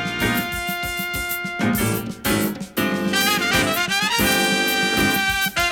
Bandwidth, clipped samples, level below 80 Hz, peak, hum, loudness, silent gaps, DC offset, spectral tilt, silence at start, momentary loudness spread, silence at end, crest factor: over 20 kHz; under 0.1%; -42 dBFS; -4 dBFS; none; -20 LUFS; none; under 0.1%; -3 dB/octave; 0 s; 7 LU; 0 s; 16 dB